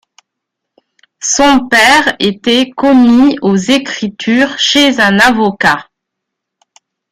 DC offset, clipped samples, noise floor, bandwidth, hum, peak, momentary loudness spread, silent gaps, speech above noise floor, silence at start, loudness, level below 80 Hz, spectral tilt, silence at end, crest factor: under 0.1%; under 0.1%; -76 dBFS; 15.5 kHz; none; 0 dBFS; 7 LU; none; 67 dB; 1.2 s; -9 LUFS; -44 dBFS; -3 dB/octave; 1.3 s; 12 dB